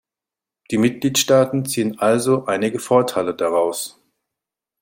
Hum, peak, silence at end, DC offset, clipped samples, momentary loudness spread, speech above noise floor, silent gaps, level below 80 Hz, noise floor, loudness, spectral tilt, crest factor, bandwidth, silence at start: none; -2 dBFS; 0.9 s; under 0.1%; under 0.1%; 7 LU; 70 dB; none; -62 dBFS; -88 dBFS; -19 LUFS; -4.5 dB/octave; 18 dB; 16.5 kHz; 0.7 s